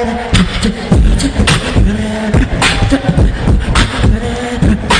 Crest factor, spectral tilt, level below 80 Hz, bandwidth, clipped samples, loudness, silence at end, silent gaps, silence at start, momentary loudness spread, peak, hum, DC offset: 10 dB; -5 dB/octave; -14 dBFS; 10 kHz; under 0.1%; -12 LUFS; 0 s; none; 0 s; 3 LU; 0 dBFS; none; under 0.1%